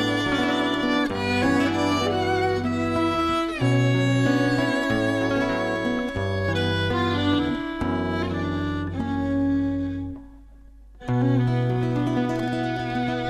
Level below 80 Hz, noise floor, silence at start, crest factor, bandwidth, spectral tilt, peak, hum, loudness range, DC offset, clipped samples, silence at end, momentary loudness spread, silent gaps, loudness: -46 dBFS; -46 dBFS; 0 s; 14 dB; 13.5 kHz; -6.5 dB/octave; -10 dBFS; none; 4 LU; under 0.1%; under 0.1%; 0 s; 6 LU; none; -23 LUFS